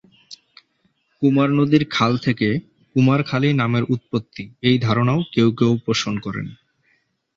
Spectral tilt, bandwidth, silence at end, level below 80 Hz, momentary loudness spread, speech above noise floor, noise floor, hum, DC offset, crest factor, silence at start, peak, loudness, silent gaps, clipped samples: -6.5 dB/octave; 7.6 kHz; 0.8 s; -54 dBFS; 10 LU; 47 dB; -66 dBFS; none; under 0.1%; 18 dB; 0.3 s; -2 dBFS; -19 LUFS; none; under 0.1%